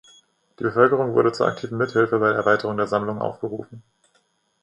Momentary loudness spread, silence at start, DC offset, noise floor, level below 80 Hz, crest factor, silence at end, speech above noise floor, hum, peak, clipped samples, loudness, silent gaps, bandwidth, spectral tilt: 10 LU; 0.6 s; under 0.1%; -66 dBFS; -62 dBFS; 20 dB; 0.85 s; 45 dB; none; -2 dBFS; under 0.1%; -21 LUFS; none; 10.5 kHz; -7 dB/octave